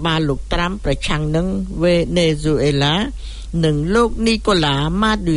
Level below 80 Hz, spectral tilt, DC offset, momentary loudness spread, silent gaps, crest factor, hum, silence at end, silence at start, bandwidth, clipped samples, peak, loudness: -28 dBFS; -5.5 dB/octave; under 0.1%; 5 LU; none; 14 dB; none; 0 s; 0 s; 11 kHz; under 0.1%; -2 dBFS; -18 LUFS